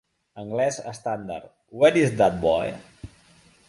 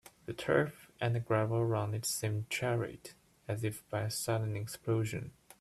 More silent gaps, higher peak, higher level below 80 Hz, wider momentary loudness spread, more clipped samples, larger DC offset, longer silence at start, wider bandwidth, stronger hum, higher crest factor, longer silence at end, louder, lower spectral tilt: neither; first, -6 dBFS vs -14 dBFS; first, -52 dBFS vs -66 dBFS; first, 20 LU vs 11 LU; neither; neither; about the same, 0.35 s vs 0.3 s; second, 11.5 kHz vs 14 kHz; neither; about the same, 20 dB vs 20 dB; first, 0.6 s vs 0.3 s; first, -23 LUFS vs -35 LUFS; about the same, -5.5 dB/octave vs -5 dB/octave